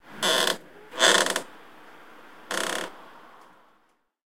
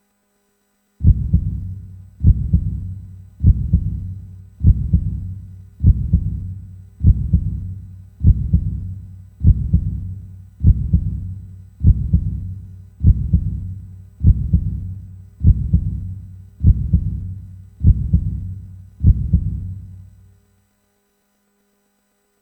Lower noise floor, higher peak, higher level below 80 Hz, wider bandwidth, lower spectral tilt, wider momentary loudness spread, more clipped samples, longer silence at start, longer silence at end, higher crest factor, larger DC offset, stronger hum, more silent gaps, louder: about the same, -67 dBFS vs -65 dBFS; second, -6 dBFS vs 0 dBFS; second, -76 dBFS vs -22 dBFS; first, 16.5 kHz vs 0.8 kHz; second, -0.5 dB/octave vs -12.5 dB/octave; about the same, 19 LU vs 19 LU; neither; second, 0.05 s vs 1 s; second, 1.15 s vs 2.4 s; first, 24 dB vs 18 dB; first, 0.3% vs under 0.1%; neither; neither; second, -24 LUFS vs -19 LUFS